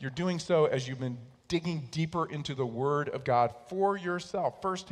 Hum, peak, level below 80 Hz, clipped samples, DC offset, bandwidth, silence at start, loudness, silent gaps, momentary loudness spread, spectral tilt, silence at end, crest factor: none; -14 dBFS; -64 dBFS; under 0.1%; under 0.1%; 11 kHz; 0 s; -31 LUFS; none; 8 LU; -6 dB/octave; 0 s; 18 dB